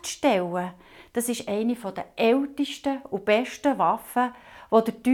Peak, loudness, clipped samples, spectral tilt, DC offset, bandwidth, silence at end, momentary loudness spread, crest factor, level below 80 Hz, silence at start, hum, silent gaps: -6 dBFS; -25 LUFS; under 0.1%; -4.5 dB/octave; under 0.1%; 18 kHz; 0 s; 8 LU; 18 dB; -64 dBFS; 0.05 s; none; none